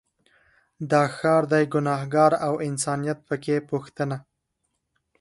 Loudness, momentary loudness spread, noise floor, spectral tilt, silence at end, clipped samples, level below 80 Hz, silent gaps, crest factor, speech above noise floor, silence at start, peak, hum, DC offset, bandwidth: -24 LUFS; 10 LU; -77 dBFS; -6 dB/octave; 1 s; under 0.1%; -66 dBFS; none; 20 dB; 54 dB; 0.8 s; -6 dBFS; none; under 0.1%; 11.5 kHz